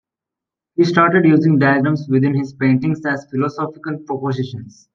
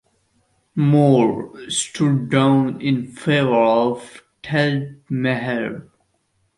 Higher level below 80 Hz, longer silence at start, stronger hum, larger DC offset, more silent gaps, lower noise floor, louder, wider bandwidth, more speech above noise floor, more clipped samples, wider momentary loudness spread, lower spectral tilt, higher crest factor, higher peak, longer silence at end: about the same, -60 dBFS vs -60 dBFS; about the same, 0.8 s vs 0.75 s; neither; neither; neither; first, -86 dBFS vs -67 dBFS; first, -16 LUFS vs -19 LUFS; second, 7.2 kHz vs 11.5 kHz; first, 70 dB vs 48 dB; neither; about the same, 13 LU vs 13 LU; first, -8 dB/octave vs -6 dB/octave; about the same, 16 dB vs 16 dB; about the same, -2 dBFS vs -2 dBFS; second, 0.25 s vs 0.75 s